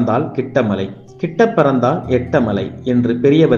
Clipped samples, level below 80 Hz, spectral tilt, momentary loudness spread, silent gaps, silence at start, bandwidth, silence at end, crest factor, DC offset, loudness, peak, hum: under 0.1%; -46 dBFS; -8 dB/octave; 9 LU; none; 0 s; 7 kHz; 0 s; 14 dB; under 0.1%; -16 LUFS; 0 dBFS; none